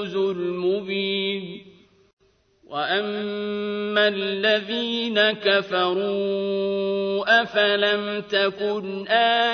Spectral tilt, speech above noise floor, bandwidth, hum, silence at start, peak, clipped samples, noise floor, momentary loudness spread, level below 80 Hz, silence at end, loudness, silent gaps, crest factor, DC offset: -5.5 dB/octave; 37 dB; 6.6 kHz; none; 0 s; -4 dBFS; under 0.1%; -59 dBFS; 9 LU; -68 dBFS; 0 s; -22 LUFS; 2.13-2.17 s; 18 dB; under 0.1%